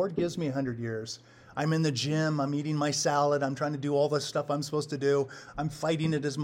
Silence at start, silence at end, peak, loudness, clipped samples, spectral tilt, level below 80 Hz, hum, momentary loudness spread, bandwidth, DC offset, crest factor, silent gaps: 0 s; 0 s; -14 dBFS; -30 LUFS; under 0.1%; -5.5 dB/octave; -62 dBFS; none; 9 LU; 15.5 kHz; under 0.1%; 16 dB; none